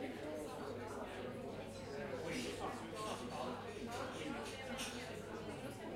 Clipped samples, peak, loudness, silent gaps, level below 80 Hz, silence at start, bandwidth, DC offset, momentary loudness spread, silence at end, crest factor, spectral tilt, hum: under 0.1%; -30 dBFS; -46 LUFS; none; -66 dBFS; 0 s; 16 kHz; under 0.1%; 4 LU; 0 s; 16 dB; -4.5 dB/octave; none